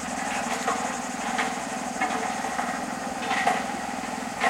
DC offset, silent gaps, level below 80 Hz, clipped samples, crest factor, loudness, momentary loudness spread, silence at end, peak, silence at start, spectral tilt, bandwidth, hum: under 0.1%; none; -58 dBFS; under 0.1%; 20 dB; -28 LUFS; 6 LU; 0 s; -8 dBFS; 0 s; -2.5 dB/octave; 16.5 kHz; none